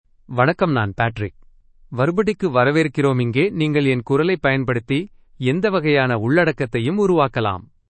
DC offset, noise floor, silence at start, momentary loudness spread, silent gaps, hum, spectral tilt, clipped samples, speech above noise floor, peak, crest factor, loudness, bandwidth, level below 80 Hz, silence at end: under 0.1%; -48 dBFS; 0.3 s; 7 LU; none; none; -7.5 dB/octave; under 0.1%; 30 dB; -2 dBFS; 18 dB; -19 LUFS; 8.8 kHz; -48 dBFS; 0.25 s